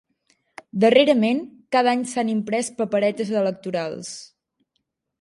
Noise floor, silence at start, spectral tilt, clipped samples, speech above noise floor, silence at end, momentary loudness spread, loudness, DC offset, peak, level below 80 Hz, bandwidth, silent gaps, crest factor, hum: -76 dBFS; 0.75 s; -4.5 dB/octave; under 0.1%; 55 dB; 0.95 s; 15 LU; -21 LUFS; under 0.1%; -2 dBFS; -72 dBFS; 11.5 kHz; none; 20 dB; none